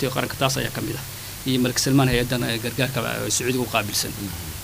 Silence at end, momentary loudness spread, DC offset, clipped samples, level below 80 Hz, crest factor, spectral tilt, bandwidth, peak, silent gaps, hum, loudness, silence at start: 0 s; 11 LU; under 0.1%; under 0.1%; -42 dBFS; 20 dB; -4 dB/octave; 16 kHz; -4 dBFS; none; none; -23 LUFS; 0 s